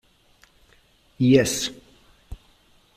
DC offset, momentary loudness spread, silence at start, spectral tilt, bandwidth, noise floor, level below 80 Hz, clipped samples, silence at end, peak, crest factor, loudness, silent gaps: under 0.1%; 28 LU; 1.2 s; -5 dB/octave; 15 kHz; -59 dBFS; -52 dBFS; under 0.1%; 0.65 s; -4 dBFS; 22 dB; -21 LUFS; none